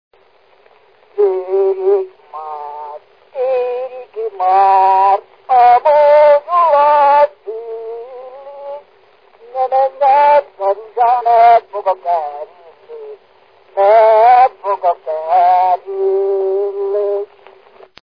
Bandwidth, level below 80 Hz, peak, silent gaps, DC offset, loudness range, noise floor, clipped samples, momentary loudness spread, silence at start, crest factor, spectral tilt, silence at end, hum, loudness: 5.2 kHz; -62 dBFS; 0 dBFS; none; 0.2%; 8 LU; -51 dBFS; under 0.1%; 21 LU; 1.15 s; 14 dB; -5.5 dB/octave; 0.8 s; none; -12 LUFS